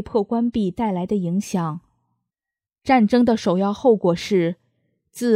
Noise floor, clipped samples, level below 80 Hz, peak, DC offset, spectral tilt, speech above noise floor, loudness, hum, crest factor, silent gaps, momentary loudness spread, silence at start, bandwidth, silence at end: -90 dBFS; under 0.1%; -54 dBFS; -4 dBFS; under 0.1%; -6.5 dB/octave; 71 dB; -20 LUFS; none; 16 dB; none; 10 LU; 0 s; 14.5 kHz; 0 s